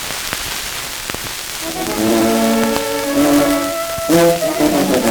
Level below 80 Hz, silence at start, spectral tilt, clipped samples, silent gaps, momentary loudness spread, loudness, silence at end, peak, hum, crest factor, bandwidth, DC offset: -40 dBFS; 0 s; -3.5 dB/octave; under 0.1%; none; 9 LU; -16 LUFS; 0 s; 0 dBFS; none; 16 dB; over 20 kHz; under 0.1%